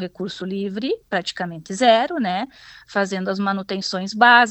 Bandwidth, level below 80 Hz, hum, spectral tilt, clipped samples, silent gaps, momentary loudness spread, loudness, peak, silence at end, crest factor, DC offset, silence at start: 19 kHz; -62 dBFS; none; -4 dB/octave; under 0.1%; none; 12 LU; -21 LUFS; 0 dBFS; 0 s; 20 dB; under 0.1%; 0 s